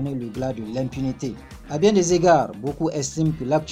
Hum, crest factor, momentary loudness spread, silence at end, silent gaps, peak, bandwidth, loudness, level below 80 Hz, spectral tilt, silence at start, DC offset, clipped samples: none; 16 dB; 13 LU; 0 s; none; -6 dBFS; 14.5 kHz; -22 LUFS; -46 dBFS; -5.5 dB/octave; 0 s; under 0.1%; under 0.1%